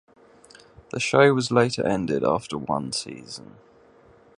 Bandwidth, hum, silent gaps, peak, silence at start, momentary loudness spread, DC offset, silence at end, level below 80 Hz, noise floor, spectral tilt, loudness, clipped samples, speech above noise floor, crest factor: 11 kHz; none; none; -2 dBFS; 0.95 s; 19 LU; under 0.1%; 1 s; -58 dBFS; -54 dBFS; -5 dB/octave; -23 LUFS; under 0.1%; 31 dB; 22 dB